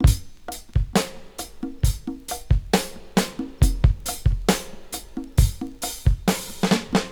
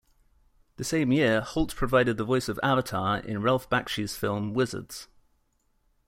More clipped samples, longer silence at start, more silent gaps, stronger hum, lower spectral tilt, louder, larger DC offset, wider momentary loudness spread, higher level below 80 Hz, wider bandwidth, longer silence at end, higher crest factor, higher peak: neither; second, 0 s vs 0.8 s; neither; neither; about the same, -5 dB/octave vs -5.5 dB/octave; first, -24 LUFS vs -27 LUFS; first, 0.1% vs under 0.1%; first, 12 LU vs 8 LU; first, -26 dBFS vs -48 dBFS; first, over 20 kHz vs 16.5 kHz; second, 0 s vs 1.05 s; about the same, 20 dB vs 20 dB; first, -2 dBFS vs -8 dBFS